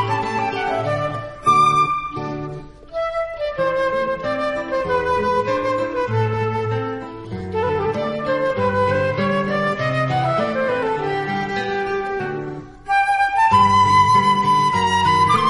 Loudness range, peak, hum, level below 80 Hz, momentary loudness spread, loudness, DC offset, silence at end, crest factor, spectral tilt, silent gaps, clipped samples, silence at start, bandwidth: 5 LU; -2 dBFS; none; -46 dBFS; 12 LU; -19 LUFS; under 0.1%; 0 s; 16 dB; -5.5 dB/octave; none; under 0.1%; 0 s; 11.5 kHz